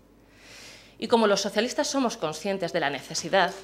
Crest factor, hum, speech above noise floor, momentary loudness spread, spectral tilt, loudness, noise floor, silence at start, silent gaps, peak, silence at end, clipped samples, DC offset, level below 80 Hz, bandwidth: 20 dB; none; 28 dB; 22 LU; -3 dB/octave; -26 LUFS; -54 dBFS; 0.45 s; none; -6 dBFS; 0 s; under 0.1%; under 0.1%; -64 dBFS; 15 kHz